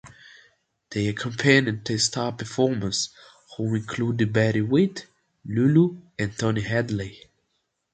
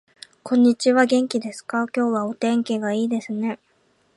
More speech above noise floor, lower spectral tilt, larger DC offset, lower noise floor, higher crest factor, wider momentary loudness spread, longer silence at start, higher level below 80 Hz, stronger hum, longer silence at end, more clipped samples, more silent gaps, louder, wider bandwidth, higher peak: first, 52 dB vs 42 dB; about the same, -5 dB/octave vs -5 dB/octave; neither; first, -75 dBFS vs -63 dBFS; about the same, 22 dB vs 18 dB; about the same, 12 LU vs 10 LU; second, 0.05 s vs 0.45 s; first, -54 dBFS vs -74 dBFS; neither; first, 0.75 s vs 0.6 s; neither; neither; second, -24 LUFS vs -21 LUFS; second, 9.4 kHz vs 11.5 kHz; about the same, -2 dBFS vs -4 dBFS